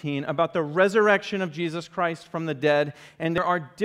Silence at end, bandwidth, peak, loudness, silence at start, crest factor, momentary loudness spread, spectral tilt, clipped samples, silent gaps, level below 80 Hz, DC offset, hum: 0 s; 12.5 kHz; -6 dBFS; -25 LUFS; 0.05 s; 18 dB; 10 LU; -6 dB/octave; under 0.1%; none; -64 dBFS; under 0.1%; none